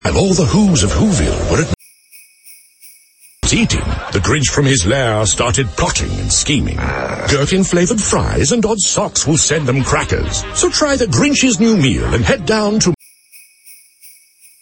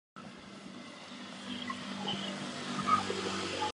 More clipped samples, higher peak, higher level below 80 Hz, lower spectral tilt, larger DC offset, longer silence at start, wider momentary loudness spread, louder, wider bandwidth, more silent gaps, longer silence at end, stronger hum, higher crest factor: neither; first, 0 dBFS vs -16 dBFS; first, -28 dBFS vs -68 dBFS; about the same, -4 dB/octave vs -3.5 dB/octave; neither; about the same, 0.05 s vs 0.15 s; second, 6 LU vs 18 LU; first, -14 LUFS vs -36 LUFS; first, 17 kHz vs 11.5 kHz; neither; first, 0.55 s vs 0 s; neither; second, 14 dB vs 22 dB